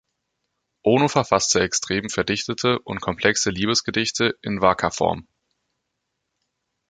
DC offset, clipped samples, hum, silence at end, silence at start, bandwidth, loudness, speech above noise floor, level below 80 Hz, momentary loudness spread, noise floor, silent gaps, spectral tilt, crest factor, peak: under 0.1%; under 0.1%; none; 1.7 s; 0.85 s; 9.6 kHz; -21 LUFS; 57 dB; -50 dBFS; 6 LU; -78 dBFS; none; -3.5 dB/octave; 22 dB; -2 dBFS